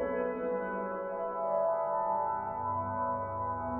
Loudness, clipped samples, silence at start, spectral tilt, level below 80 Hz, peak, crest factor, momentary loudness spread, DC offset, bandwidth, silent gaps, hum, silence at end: -33 LUFS; under 0.1%; 0 s; -11 dB/octave; -60 dBFS; -20 dBFS; 14 dB; 5 LU; under 0.1%; 3.2 kHz; none; none; 0 s